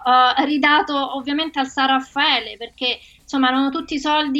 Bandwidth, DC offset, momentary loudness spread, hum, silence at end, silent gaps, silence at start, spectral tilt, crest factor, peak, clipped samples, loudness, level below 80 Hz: 8.2 kHz; under 0.1%; 8 LU; none; 0 s; none; 0 s; -2.5 dB/octave; 16 dB; -4 dBFS; under 0.1%; -18 LUFS; -56 dBFS